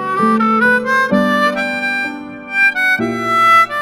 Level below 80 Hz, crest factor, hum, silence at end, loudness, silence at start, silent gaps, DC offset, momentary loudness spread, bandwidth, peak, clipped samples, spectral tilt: -52 dBFS; 14 dB; none; 0 s; -13 LUFS; 0 s; none; under 0.1%; 9 LU; 16.5 kHz; 0 dBFS; under 0.1%; -5 dB/octave